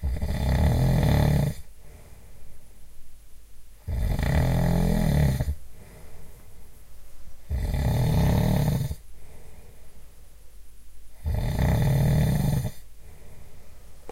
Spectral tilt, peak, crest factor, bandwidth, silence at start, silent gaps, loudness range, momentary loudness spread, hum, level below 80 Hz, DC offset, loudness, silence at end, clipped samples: -7 dB/octave; -8 dBFS; 18 dB; 16 kHz; 0 s; none; 4 LU; 13 LU; none; -32 dBFS; under 0.1%; -25 LUFS; 0 s; under 0.1%